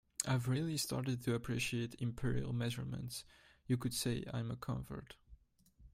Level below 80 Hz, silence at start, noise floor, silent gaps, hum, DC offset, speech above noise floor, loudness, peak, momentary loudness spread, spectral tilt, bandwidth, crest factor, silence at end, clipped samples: -58 dBFS; 0.2 s; -67 dBFS; none; none; under 0.1%; 29 dB; -39 LUFS; -14 dBFS; 12 LU; -5 dB/octave; 16 kHz; 26 dB; 0.05 s; under 0.1%